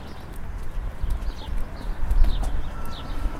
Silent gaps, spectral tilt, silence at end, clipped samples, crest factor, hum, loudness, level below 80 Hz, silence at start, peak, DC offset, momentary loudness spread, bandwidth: none; -6 dB/octave; 0 s; under 0.1%; 18 dB; none; -32 LUFS; -24 dBFS; 0 s; -4 dBFS; under 0.1%; 11 LU; 11.5 kHz